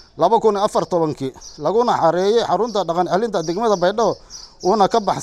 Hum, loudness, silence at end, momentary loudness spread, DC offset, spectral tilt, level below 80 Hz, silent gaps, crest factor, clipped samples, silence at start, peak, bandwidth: none; -18 LUFS; 0 s; 9 LU; under 0.1%; -5 dB/octave; -50 dBFS; none; 16 dB; under 0.1%; 0.15 s; -2 dBFS; 12.5 kHz